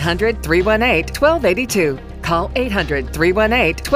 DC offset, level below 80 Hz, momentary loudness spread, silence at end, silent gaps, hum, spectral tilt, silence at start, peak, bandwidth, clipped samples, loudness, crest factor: under 0.1%; -28 dBFS; 6 LU; 0 s; none; none; -5 dB/octave; 0 s; -2 dBFS; 16 kHz; under 0.1%; -16 LUFS; 14 dB